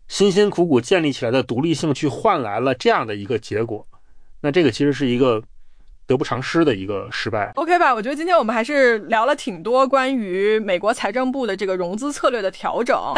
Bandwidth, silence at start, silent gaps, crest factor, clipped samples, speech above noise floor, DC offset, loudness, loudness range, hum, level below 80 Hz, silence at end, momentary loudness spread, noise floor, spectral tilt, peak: 10.5 kHz; 0.05 s; none; 14 dB; under 0.1%; 22 dB; under 0.1%; -19 LUFS; 3 LU; none; -50 dBFS; 0 s; 8 LU; -41 dBFS; -5.5 dB/octave; -4 dBFS